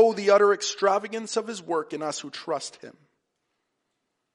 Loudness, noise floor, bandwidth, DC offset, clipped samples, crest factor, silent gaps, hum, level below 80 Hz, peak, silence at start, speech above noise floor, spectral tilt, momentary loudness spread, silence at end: -25 LUFS; -79 dBFS; 11.5 kHz; under 0.1%; under 0.1%; 20 dB; none; none; -84 dBFS; -6 dBFS; 0 s; 54 dB; -3 dB/octave; 13 LU; 1.45 s